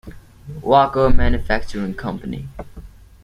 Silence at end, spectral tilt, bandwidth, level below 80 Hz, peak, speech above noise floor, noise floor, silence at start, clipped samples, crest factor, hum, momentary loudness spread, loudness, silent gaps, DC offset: 0.35 s; -7 dB/octave; 6.6 kHz; -26 dBFS; 0 dBFS; 24 dB; -39 dBFS; 0.05 s; under 0.1%; 16 dB; none; 21 LU; -20 LUFS; none; under 0.1%